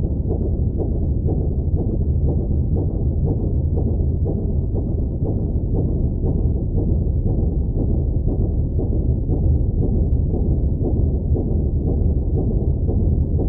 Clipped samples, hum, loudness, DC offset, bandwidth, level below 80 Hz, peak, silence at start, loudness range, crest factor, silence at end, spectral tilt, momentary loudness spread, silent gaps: under 0.1%; none; -21 LUFS; under 0.1%; 1.2 kHz; -22 dBFS; -8 dBFS; 0 s; 1 LU; 12 dB; 0 s; -16.5 dB/octave; 2 LU; none